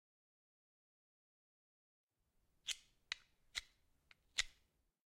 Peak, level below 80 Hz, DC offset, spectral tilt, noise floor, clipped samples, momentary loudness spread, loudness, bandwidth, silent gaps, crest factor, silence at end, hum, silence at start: -16 dBFS; -72 dBFS; under 0.1%; 2.5 dB/octave; -82 dBFS; under 0.1%; 7 LU; -47 LUFS; 16 kHz; none; 38 dB; 0.55 s; none; 2.65 s